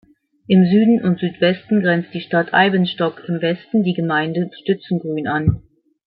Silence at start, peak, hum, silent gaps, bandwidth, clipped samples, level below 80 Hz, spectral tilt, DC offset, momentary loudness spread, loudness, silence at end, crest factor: 0.5 s; -2 dBFS; none; none; 4.8 kHz; under 0.1%; -46 dBFS; -11.5 dB/octave; under 0.1%; 9 LU; -18 LUFS; 0.55 s; 16 dB